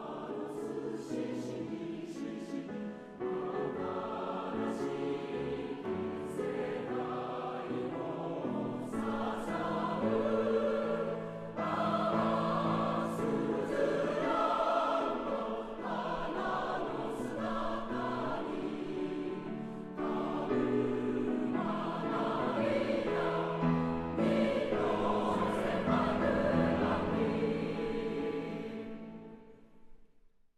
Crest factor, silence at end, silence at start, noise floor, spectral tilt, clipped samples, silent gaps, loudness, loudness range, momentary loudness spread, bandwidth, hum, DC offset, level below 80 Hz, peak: 16 dB; 0.4 s; 0 s; -63 dBFS; -7 dB/octave; under 0.1%; none; -35 LUFS; 6 LU; 9 LU; 13 kHz; none; under 0.1%; -58 dBFS; -18 dBFS